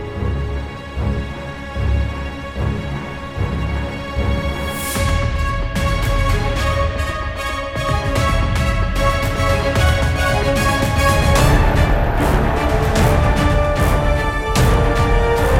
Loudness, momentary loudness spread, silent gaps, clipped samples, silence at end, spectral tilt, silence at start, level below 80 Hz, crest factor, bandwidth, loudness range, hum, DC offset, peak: -18 LUFS; 9 LU; none; under 0.1%; 0 s; -5.5 dB/octave; 0 s; -20 dBFS; 16 dB; 16.5 kHz; 7 LU; none; under 0.1%; -2 dBFS